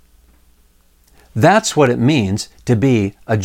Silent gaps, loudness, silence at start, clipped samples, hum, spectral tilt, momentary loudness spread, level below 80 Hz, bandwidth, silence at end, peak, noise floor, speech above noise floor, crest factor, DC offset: none; -15 LUFS; 1.35 s; under 0.1%; none; -5.5 dB/octave; 9 LU; -48 dBFS; 16.5 kHz; 0 s; 0 dBFS; -53 dBFS; 38 dB; 16 dB; under 0.1%